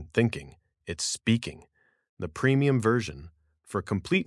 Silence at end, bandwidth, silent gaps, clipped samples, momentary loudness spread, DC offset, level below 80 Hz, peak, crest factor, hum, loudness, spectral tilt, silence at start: 0.05 s; 12 kHz; 2.09-2.17 s; under 0.1%; 16 LU; under 0.1%; -58 dBFS; -10 dBFS; 20 dB; none; -27 LUFS; -5.5 dB/octave; 0 s